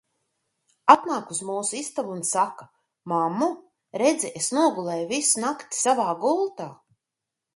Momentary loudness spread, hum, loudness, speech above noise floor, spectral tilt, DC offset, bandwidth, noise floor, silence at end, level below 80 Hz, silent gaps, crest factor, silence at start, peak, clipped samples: 11 LU; none; -24 LUFS; 62 dB; -3 dB/octave; under 0.1%; 12 kHz; -86 dBFS; 0.8 s; -74 dBFS; none; 24 dB; 0.85 s; 0 dBFS; under 0.1%